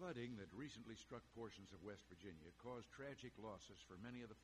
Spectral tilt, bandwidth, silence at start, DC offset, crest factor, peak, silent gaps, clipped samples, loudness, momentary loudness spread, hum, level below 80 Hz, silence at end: -5.5 dB/octave; 13 kHz; 0 s; under 0.1%; 18 dB; -38 dBFS; none; under 0.1%; -57 LUFS; 6 LU; none; -76 dBFS; 0 s